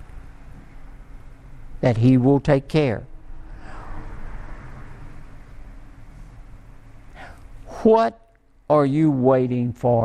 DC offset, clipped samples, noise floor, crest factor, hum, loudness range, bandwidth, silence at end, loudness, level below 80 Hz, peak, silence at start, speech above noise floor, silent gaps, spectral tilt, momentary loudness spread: under 0.1%; under 0.1%; -42 dBFS; 18 dB; none; 22 LU; 10 kHz; 0 s; -19 LUFS; -40 dBFS; -4 dBFS; 0 s; 25 dB; none; -9 dB/octave; 26 LU